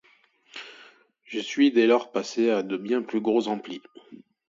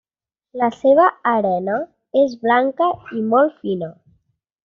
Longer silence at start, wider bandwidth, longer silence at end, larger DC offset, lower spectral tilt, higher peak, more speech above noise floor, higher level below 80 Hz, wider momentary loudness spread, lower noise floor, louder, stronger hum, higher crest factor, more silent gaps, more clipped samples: about the same, 0.55 s vs 0.55 s; about the same, 7.6 kHz vs 7 kHz; second, 0.35 s vs 0.75 s; neither; about the same, -4.5 dB/octave vs -4.5 dB/octave; second, -8 dBFS vs -2 dBFS; second, 37 dB vs 63 dB; second, -78 dBFS vs -64 dBFS; first, 20 LU vs 11 LU; second, -61 dBFS vs -81 dBFS; second, -25 LUFS vs -18 LUFS; neither; about the same, 18 dB vs 16 dB; neither; neither